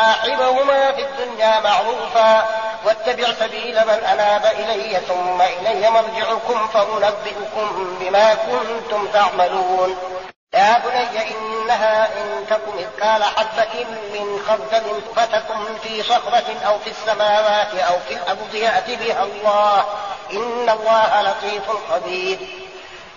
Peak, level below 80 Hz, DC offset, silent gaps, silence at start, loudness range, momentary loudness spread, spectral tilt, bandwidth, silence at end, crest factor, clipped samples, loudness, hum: -4 dBFS; -58 dBFS; 0.3%; 10.36-10.47 s; 0 s; 3 LU; 9 LU; 0.5 dB/octave; 7.4 kHz; 0 s; 14 dB; under 0.1%; -18 LUFS; none